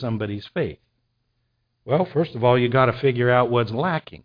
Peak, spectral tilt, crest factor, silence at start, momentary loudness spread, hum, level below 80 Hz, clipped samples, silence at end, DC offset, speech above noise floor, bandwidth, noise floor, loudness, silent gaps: -4 dBFS; -9.5 dB/octave; 18 dB; 0 s; 10 LU; none; -54 dBFS; under 0.1%; 0.1 s; under 0.1%; 51 dB; 5.2 kHz; -72 dBFS; -21 LUFS; none